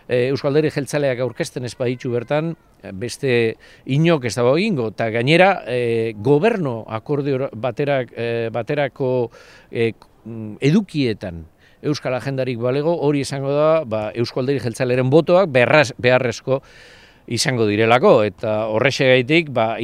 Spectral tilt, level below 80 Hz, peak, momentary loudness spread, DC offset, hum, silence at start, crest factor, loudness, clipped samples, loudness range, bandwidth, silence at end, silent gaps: -6 dB/octave; -54 dBFS; 0 dBFS; 11 LU; under 0.1%; none; 0.1 s; 18 dB; -19 LUFS; under 0.1%; 6 LU; 14 kHz; 0 s; none